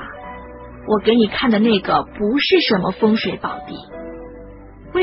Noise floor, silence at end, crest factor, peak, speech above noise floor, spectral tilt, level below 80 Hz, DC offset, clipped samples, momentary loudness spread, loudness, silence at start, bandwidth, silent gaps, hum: -38 dBFS; 0 s; 18 dB; -2 dBFS; 21 dB; -9.5 dB/octave; -44 dBFS; under 0.1%; under 0.1%; 20 LU; -17 LUFS; 0 s; 5.8 kHz; none; none